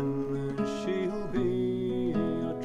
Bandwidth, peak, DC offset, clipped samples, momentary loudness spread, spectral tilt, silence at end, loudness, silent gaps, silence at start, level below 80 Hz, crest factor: 10.5 kHz; -18 dBFS; under 0.1%; under 0.1%; 3 LU; -7.5 dB/octave; 0 s; -31 LUFS; none; 0 s; -50 dBFS; 12 dB